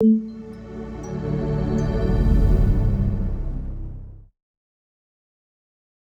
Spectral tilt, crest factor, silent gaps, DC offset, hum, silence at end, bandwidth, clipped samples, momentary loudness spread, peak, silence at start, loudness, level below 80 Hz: -9.5 dB/octave; 16 dB; none; under 0.1%; none; 1.8 s; 6.6 kHz; under 0.1%; 17 LU; -6 dBFS; 0 s; -23 LUFS; -26 dBFS